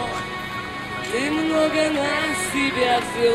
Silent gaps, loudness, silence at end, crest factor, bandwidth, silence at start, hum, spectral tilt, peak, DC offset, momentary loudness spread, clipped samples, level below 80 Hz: none; -22 LUFS; 0 s; 16 dB; 15.5 kHz; 0 s; none; -3.5 dB/octave; -6 dBFS; under 0.1%; 9 LU; under 0.1%; -48 dBFS